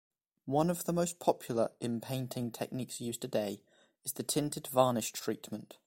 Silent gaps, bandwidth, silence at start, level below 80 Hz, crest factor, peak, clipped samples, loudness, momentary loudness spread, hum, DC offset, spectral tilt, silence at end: none; 16.5 kHz; 0.45 s; -70 dBFS; 22 dB; -12 dBFS; under 0.1%; -35 LUFS; 11 LU; none; under 0.1%; -5 dB/octave; 0.1 s